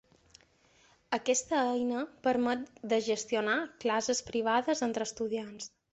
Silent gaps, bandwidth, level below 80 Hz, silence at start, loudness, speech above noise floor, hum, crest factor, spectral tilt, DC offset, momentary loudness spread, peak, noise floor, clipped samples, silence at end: none; 8.2 kHz; -70 dBFS; 1.1 s; -31 LUFS; 34 dB; none; 18 dB; -2.5 dB/octave; under 0.1%; 7 LU; -14 dBFS; -65 dBFS; under 0.1%; 0.25 s